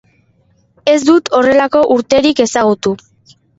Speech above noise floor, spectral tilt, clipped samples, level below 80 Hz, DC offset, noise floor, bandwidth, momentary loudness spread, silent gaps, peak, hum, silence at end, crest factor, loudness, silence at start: 44 dB; -4 dB/octave; under 0.1%; -50 dBFS; under 0.1%; -54 dBFS; 8 kHz; 8 LU; none; 0 dBFS; none; 0.6 s; 12 dB; -12 LUFS; 0.85 s